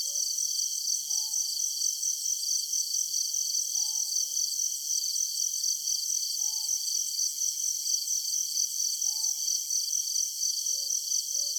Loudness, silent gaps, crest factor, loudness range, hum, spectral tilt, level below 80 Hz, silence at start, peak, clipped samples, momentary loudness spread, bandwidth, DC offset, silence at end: -27 LUFS; none; 16 dB; 0 LU; none; 5 dB/octave; -86 dBFS; 0 s; -14 dBFS; under 0.1%; 1 LU; over 20 kHz; under 0.1%; 0 s